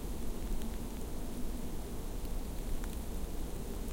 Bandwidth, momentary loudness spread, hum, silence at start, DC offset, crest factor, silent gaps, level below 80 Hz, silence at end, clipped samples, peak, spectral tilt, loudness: 17 kHz; 2 LU; none; 0 s; under 0.1%; 12 dB; none; -38 dBFS; 0 s; under 0.1%; -24 dBFS; -5.5 dB/octave; -43 LUFS